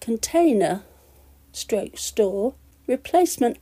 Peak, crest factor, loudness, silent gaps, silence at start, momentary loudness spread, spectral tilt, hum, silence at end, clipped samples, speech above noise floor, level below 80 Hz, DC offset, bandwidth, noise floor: -8 dBFS; 16 dB; -23 LUFS; none; 0 s; 13 LU; -4 dB/octave; none; 0.05 s; under 0.1%; 31 dB; -52 dBFS; under 0.1%; 15.5 kHz; -53 dBFS